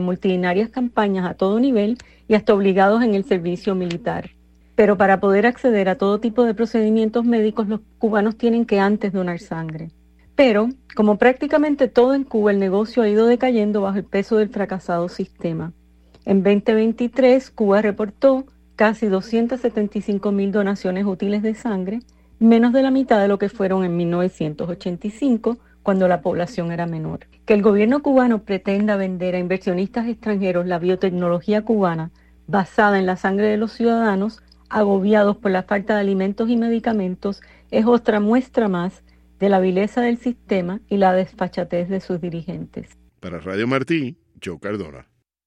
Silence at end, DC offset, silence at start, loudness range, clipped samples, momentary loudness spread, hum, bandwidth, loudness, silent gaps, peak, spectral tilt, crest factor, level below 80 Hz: 0.45 s; under 0.1%; 0 s; 4 LU; under 0.1%; 11 LU; none; 8.6 kHz; -19 LUFS; none; -2 dBFS; -8 dB/octave; 18 dB; -52 dBFS